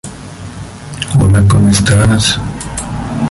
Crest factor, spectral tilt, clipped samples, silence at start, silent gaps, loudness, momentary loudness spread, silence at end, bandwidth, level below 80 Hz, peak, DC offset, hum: 12 dB; -5 dB/octave; under 0.1%; 0.05 s; none; -11 LUFS; 19 LU; 0 s; 11.5 kHz; -26 dBFS; 0 dBFS; under 0.1%; none